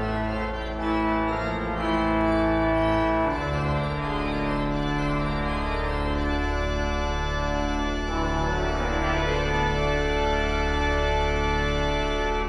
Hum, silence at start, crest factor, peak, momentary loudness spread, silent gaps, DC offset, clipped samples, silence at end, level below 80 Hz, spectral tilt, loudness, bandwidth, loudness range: none; 0 s; 12 dB; -12 dBFS; 5 LU; none; under 0.1%; under 0.1%; 0 s; -30 dBFS; -6 dB/octave; -25 LUFS; 11 kHz; 2 LU